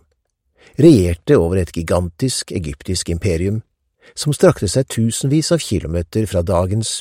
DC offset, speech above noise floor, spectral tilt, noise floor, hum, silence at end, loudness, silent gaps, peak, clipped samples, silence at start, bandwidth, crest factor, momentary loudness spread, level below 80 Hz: under 0.1%; 51 dB; -5.5 dB/octave; -67 dBFS; none; 0 s; -17 LUFS; none; 0 dBFS; under 0.1%; 0.8 s; 16 kHz; 16 dB; 10 LU; -36 dBFS